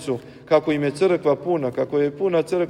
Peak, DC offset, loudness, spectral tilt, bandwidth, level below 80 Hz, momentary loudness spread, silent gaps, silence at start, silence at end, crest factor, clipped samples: -4 dBFS; under 0.1%; -21 LUFS; -6.5 dB/octave; 12 kHz; -60 dBFS; 4 LU; none; 0 s; 0 s; 16 dB; under 0.1%